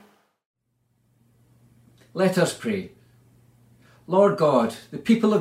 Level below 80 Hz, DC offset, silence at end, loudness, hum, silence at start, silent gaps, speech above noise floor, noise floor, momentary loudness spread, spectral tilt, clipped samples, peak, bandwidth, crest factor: -68 dBFS; under 0.1%; 0 s; -22 LUFS; none; 2.15 s; none; 49 dB; -70 dBFS; 13 LU; -6 dB/octave; under 0.1%; -6 dBFS; 15.5 kHz; 20 dB